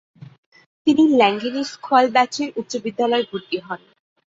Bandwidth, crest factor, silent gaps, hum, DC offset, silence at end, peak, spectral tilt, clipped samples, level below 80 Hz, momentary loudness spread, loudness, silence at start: 7.8 kHz; 18 dB; 0.38-0.52 s, 0.66-0.85 s; none; under 0.1%; 0.55 s; -2 dBFS; -4 dB/octave; under 0.1%; -66 dBFS; 13 LU; -19 LUFS; 0.2 s